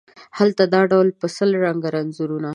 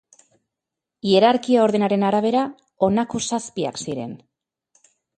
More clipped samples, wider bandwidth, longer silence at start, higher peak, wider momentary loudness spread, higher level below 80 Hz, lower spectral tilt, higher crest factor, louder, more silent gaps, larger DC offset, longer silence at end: neither; first, 11 kHz vs 9.6 kHz; second, 0.2 s vs 1.05 s; about the same, -2 dBFS vs -4 dBFS; second, 10 LU vs 13 LU; second, -70 dBFS vs -62 dBFS; first, -6.5 dB/octave vs -5 dB/octave; about the same, 18 dB vs 18 dB; about the same, -19 LUFS vs -20 LUFS; neither; neither; second, 0 s vs 1 s